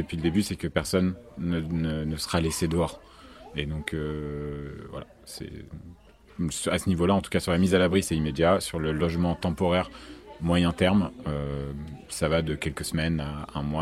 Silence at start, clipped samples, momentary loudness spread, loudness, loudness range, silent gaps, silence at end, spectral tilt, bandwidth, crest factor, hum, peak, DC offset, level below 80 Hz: 0 s; under 0.1%; 16 LU; -27 LUFS; 9 LU; none; 0 s; -5.5 dB/octave; 14.5 kHz; 22 dB; none; -6 dBFS; under 0.1%; -44 dBFS